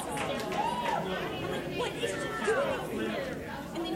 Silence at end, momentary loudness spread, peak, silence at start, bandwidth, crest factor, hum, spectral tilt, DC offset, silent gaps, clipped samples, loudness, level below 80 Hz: 0 s; 6 LU; -16 dBFS; 0 s; 16 kHz; 16 dB; none; -4.5 dB/octave; under 0.1%; none; under 0.1%; -33 LUFS; -56 dBFS